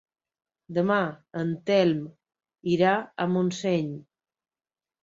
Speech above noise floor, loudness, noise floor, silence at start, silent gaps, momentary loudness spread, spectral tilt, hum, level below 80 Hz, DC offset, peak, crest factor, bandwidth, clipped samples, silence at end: over 65 dB; -26 LUFS; under -90 dBFS; 0.7 s; none; 12 LU; -6.5 dB/octave; none; -68 dBFS; under 0.1%; -8 dBFS; 20 dB; 7.8 kHz; under 0.1%; 1.05 s